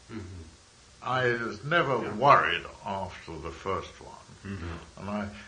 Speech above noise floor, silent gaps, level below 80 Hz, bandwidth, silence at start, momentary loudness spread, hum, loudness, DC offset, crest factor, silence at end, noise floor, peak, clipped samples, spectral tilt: 26 dB; none; -56 dBFS; 10 kHz; 0.1 s; 23 LU; none; -28 LUFS; under 0.1%; 26 dB; 0 s; -55 dBFS; -4 dBFS; under 0.1%; -5.5 dB/octave